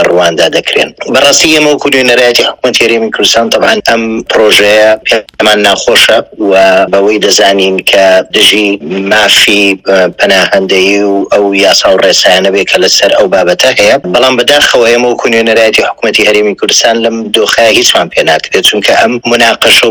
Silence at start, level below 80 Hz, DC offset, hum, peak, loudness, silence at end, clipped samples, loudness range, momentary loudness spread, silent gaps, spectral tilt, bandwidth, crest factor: 0 s; -42 dBFS; under 0.1%; none; 0 dBFS; -5 LUFS; 0 s; 9%; 1 LU; 5 LU; none; -2 dB/octave; over 20 kHz; 6 dB